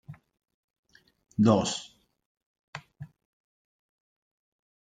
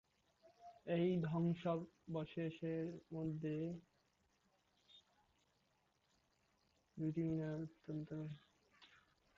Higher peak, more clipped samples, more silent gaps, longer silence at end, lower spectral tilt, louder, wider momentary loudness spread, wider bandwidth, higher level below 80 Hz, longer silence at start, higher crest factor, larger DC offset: first, -8 dBFS vs -30 dBFS; neither; first, 0.54-0.83 s, 2.25-2.35 s, 2.46-2.73 s vs none; first, 1.85 s vs 0.5 s; second, -5.5 dB/octave vs -8 dB/octave; first, -26 LUFS vs -44 LUFS; first, 26 LU vs 16 LU; first, 9.4 kHz vs 7.2 kHz; first, -68 dBFS vs -76 dBFS; second, 0.1 s vs 0.45 s; first, 26 dB vs 16 dB; neither